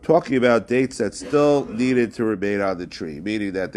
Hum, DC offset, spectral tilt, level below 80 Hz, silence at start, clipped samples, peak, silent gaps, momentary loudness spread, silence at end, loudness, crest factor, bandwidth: none; under 0.1%; -6 dB/octave; -52 dBFS; 0.05 s; under 0.1%; -4 dBFS; none; 9 LU; 0 s; -21 LUFS; 18 dB; 12 kHz